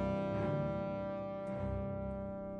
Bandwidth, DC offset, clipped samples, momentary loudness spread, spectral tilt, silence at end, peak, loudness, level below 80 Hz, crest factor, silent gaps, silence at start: 8.4 kHz; under 0.1%; under 0.1%; 5 LU; -9.5 dB/octave; 0 s; -26 dBFS; -39 LUFS; -52 dBFS; 12 dB; none; 0 s